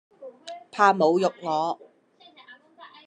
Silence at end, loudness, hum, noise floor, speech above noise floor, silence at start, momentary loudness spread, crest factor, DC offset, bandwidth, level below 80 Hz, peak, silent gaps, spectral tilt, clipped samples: 0.2 s; -23 LUFS; none; -56 dBFS; 35 dB; 0.2 s; 22 LU; 22 dB; under 0.1%; 10 kHz; -84 dBFS; -4 dBFS; none; -5.5 dB/octave; under 0.1%